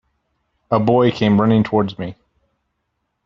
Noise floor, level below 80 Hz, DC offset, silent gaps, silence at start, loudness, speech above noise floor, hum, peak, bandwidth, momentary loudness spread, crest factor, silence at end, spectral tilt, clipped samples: -73 dBFS; -52 dBFS; under 0.1%; none; 0.7 s; -16 LUFS; 57 dB; none; 0 dBFS; 6.6 kHz; 12 LU; 18 dB; 1.1 s; -6.5 dB/octave; under 0.1%